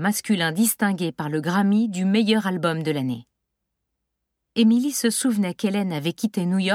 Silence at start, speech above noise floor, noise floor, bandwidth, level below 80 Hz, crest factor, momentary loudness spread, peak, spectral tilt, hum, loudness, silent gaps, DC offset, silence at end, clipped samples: 0 s; 58 dB; -80 dBFS; 16.5 kHz; -72 dBFS; 14 dB; 7 LU; -8 dBFS; -4.5 dB/octave; none; -22 LUFS; none; under 0.1%; 0 s; under 0.1%